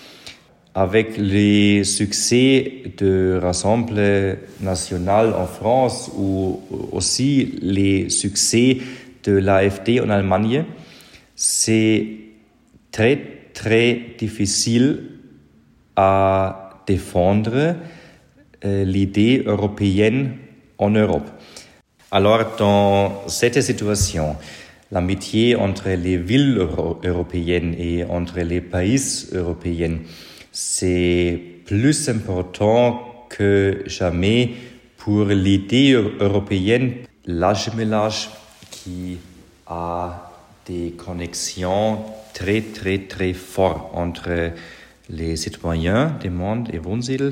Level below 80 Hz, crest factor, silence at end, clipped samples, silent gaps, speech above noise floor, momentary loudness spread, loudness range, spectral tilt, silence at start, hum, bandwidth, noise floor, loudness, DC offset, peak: -42 dBFS; 18 dB; 0 s; under 0.1%; none; 35 dB; 14 LU; 6 LU; -5 dB/octave; 0 s; none; 16 kHz; -54 dBFS; -19 LUFS; under 0.1%; -2 dBFS